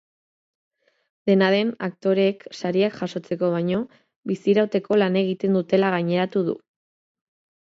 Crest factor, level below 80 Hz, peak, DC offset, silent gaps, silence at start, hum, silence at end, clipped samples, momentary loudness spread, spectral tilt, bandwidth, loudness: 18 dB; -68 dBFS; -4 dBFS; under 0.1%; 4.16-4.22 s; 1.25 s; none; 1.1 s; under 0.1%; 10 LU; -7.5 dB/octave; 7.6 kHz; -22 LUFS